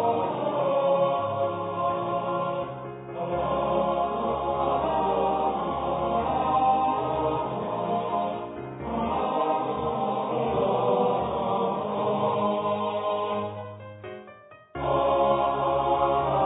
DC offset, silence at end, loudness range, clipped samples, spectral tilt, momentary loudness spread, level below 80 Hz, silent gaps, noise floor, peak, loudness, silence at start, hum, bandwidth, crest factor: under 0.1%; 0 s; 3 LU; under 0.1%; -10.5 dB/octave; 10 LU; -50 dBFS; none; -49 dBFS; -12 dBFS; -26 LUFS; 0 s; none; 4 kHz; 14 dB